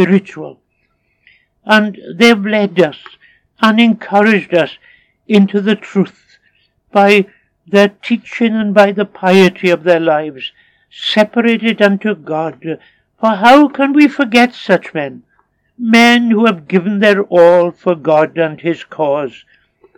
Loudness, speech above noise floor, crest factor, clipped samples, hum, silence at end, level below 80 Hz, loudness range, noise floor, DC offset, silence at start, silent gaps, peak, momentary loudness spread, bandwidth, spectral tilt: -12 LUFS; 51 dB; 12 dB; 0.3%; none; 0.7 s; -62 dBFS; 4 LU; -62 dBFS; under 0.1%; 0 s; none; 0 dBFS; 13 LU; 14.5 kHz; -6 dB/octave